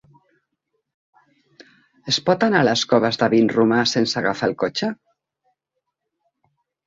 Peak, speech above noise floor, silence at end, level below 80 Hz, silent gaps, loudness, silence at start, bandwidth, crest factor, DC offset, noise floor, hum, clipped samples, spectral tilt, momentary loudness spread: -2 dBFS; 61 dB; 1.9 s; -62 dBFS; none; -19 LUFS; 1.6 s; 7.8 kHz; 20 dB; under 0.1%; -79 dBFS; none; under 0.1%; -4.5 dB/octave; 9 LU